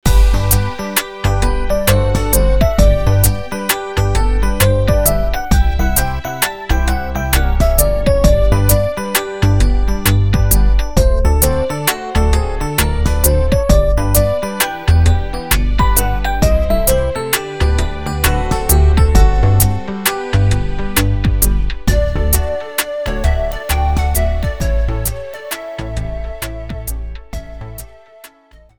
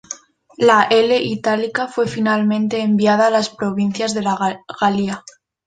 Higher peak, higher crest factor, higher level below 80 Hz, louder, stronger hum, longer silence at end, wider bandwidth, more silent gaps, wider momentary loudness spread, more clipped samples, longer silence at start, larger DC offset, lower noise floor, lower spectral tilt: about the same, 0 dBFS vs -2 dBFS; about the same, 14 dB vs 16 dB; first, -16 dBFS vs -58 dBFS; about the same, -15 LUFS vs -17 LUFS; neither; second, 0 s vs 0.45 s; first, 19.5 kHz vs 9.4 kHz; neither; about the same, 9 LU vs 8 LU; neither; about the same, 0 s vs 0.1 s; first, 5% vs under 0.1%; first, -45 dBFS vs -37 dBFS; about the same, -5 dB/octave vs -5 dB/octave